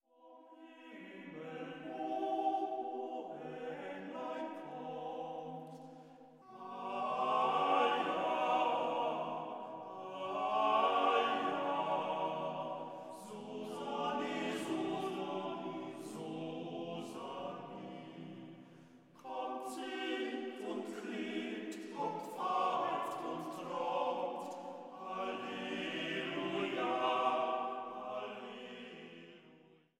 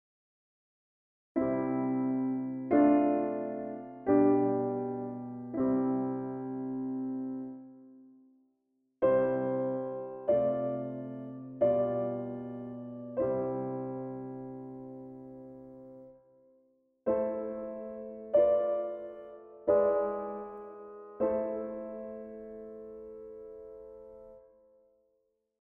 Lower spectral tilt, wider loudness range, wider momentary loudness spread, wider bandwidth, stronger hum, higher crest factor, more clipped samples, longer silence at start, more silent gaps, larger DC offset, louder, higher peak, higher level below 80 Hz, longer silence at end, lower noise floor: second, -5 dB/octave vs -9 dB/octave; about the same, 10 LU vs 11 LU; second, 17 LU vs 21 LU; first, 15.5 kHz vs 3.4 kHz; neither; about the same, 20 dB vs 20 dB; neither; second, 0.2 s vs 1.35 s; neither; neither; second, -38 LUFS vs -32 LUFS; second, -20 dBFS vs -14 dBFS; second, under -90 dBFS vs -68 dBFS; second, 0.4 s vs 1.2 s; second, -64 dBFS vs -77 dBFS